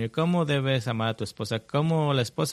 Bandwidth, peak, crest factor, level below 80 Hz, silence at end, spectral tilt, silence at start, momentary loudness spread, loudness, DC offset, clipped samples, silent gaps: 14 kHz; -12 dBFS; 14 dB; -62 dBFS; 0 s; -6 dB/octave; 0 s; 7 LU; -26 LUFS; under 0.1%; under 0.1%; none